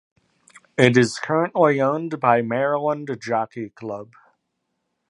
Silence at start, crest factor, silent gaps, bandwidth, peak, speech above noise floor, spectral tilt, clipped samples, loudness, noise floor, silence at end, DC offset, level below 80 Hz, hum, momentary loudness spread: 0.8 s; 22 dB; none; 11.5 kHz; 0 dBFS; 55 dB; -6 dB/octave; under 0.1%; -20 LUFS; -76 dBFS; 1.05 s; under 0.1%; -64 dBFS; none; 15 LU